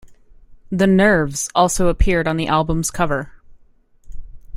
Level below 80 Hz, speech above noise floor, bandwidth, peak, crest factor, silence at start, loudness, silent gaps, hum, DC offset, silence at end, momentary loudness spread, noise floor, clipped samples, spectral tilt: -28 dBFS; 34 dB; 16 kHz; -2 dBFS; 18 dB; 0.05 s; -18 LUFS; none; none; under 0.1%; 0 s; 8 LU; -51 dBFS; under 0.1%; -5 dB/octave